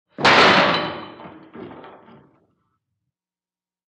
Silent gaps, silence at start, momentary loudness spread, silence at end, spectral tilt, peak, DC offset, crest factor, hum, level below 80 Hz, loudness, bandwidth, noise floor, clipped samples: none; 0.2 s; 27 LU; 2.2 s; -3.5 dB/octave; -2 dBFS; under 0.1%; 20 dB; none; -58 dBFS; -14 LUFS; 11 kHz; under -90 dBFS; under 0.1%